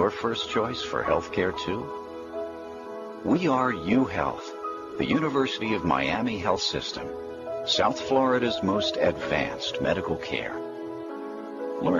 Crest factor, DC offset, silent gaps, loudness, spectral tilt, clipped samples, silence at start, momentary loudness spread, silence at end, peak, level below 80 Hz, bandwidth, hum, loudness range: 18 dB; under 0.1%; none; -27 LUFS; -5 dB/octave; under 0.1%; 0 s; 12 LU; 0 s; -10 dBFS; -54 dBFS; 12 kHz; none; 3 LU